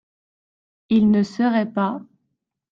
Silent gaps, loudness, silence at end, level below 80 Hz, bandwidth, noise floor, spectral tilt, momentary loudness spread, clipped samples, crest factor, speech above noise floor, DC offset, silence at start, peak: none; -20 LUFS; 0.7 s; -60 dBFS; 7.2 kHz; -76 dBFS; -8 dB/octave; 8 LU; under 0.1%; 14 dB; 58 dB; under 0.1%; 0.9 s; -8 dBFS